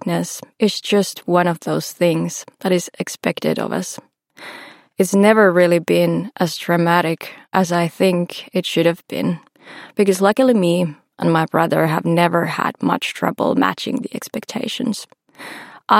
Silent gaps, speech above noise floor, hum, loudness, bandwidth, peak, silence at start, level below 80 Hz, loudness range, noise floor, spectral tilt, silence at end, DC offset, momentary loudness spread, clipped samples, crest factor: none; 22 dB; none; -18 LUFS; 16.5 kHz; 0 dBFS; 0.05 s; -68 dBFS; 5 LU; -39 dBFS; -5.5 dB/octave; 0 s; under 0.1%; 14 LU; under 0.1%; 18 dB